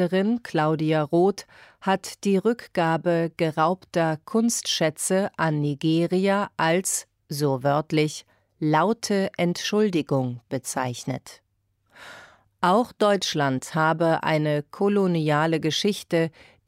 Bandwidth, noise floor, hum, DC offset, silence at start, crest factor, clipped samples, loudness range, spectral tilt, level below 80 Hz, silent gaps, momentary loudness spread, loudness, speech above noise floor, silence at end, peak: 16 kHz; -69 dBFS; none; under 0.1%; 0 s; 16 dB; under 0.1%; 4 LU; -5 dB/octave; -66 dBFS; none; 7 LU; -24 LUFS; 46 dB; 0.4 s; -8 dBFS